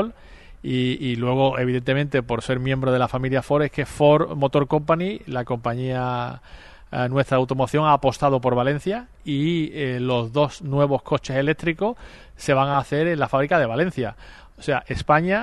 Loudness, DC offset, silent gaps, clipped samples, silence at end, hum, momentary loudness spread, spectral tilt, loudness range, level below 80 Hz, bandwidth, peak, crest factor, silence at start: -22 LUFS; under 0.1%; none; under 0.1%; 0 s; none; 9 LU; -7 dB/octave; 2 LU; -46 dBFS; 12 kHz; -4 dBFS; 18 dB; 0 s